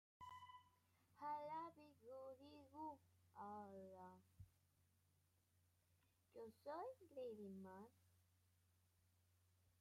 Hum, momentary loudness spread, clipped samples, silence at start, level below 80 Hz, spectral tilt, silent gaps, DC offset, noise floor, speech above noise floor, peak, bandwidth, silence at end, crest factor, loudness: none; 14 LU; under 0.1%; 0.2 s; -90 dBFS; -6.5 dB/octave; none; under 0.1%; -83 dBFS; 26 dB; -42 dBFS; 15 kHz; 0.1 s; 18 dB; -58 LUFS